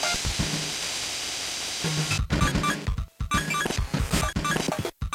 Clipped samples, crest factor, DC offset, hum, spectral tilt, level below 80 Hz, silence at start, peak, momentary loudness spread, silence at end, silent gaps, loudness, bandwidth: under 0.1%; 18 dB; under 0.1%; none; -3.5 dB/octave; -36 dBFS; 0 s; -10 dBFS; 4 LU; 0 s; none; -27 LUFS; 17 kHz